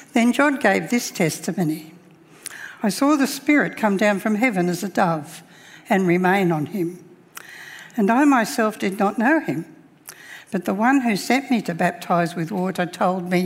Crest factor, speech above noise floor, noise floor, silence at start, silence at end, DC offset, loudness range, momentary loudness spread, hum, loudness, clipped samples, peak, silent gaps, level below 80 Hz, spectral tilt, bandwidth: 18 dB; 28 dB; -48 dBFS; 0 s; 0 s; under 0.1%; 2 LU; 19 LU; none; -20 LUFS; under 0.1%; -2 dBFS; none; -70 dBFS; -5.5 dB/octave; 16 kHz